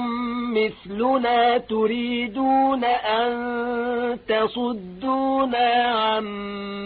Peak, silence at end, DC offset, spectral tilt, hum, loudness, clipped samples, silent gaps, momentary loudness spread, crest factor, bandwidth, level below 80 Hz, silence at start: -8 dBFS; 0 s; under 0.1%; -9.5 dB/octave; none; -22 LUFS; under 0.1%; none; 7 LU; 14 dB; 4.8 kHz; -56 dBFS; 0 s